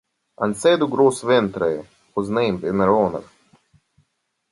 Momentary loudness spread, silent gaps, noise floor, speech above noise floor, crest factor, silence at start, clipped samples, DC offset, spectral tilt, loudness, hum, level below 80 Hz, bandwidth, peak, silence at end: 11 LU; none; -72 dBFS; 53 dB; 18 dB; 0.4 s; under 0.1%; under 0.1%; -5.5 dB/octave; -20 LUFS; none; -54 dBFS; 11.5 kHz; -4 dBFS; 1.3 s